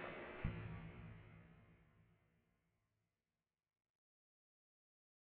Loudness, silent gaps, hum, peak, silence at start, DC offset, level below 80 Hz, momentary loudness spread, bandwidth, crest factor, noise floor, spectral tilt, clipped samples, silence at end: -52 LUFS; none; none; -28 dBFS; 0 s; under 0.1%; -62 dBFS; 18 LU; 4.6 kHz; 28 dB; under -90 dBFS; -6 dB/octave; under 0.1%; 3.1 s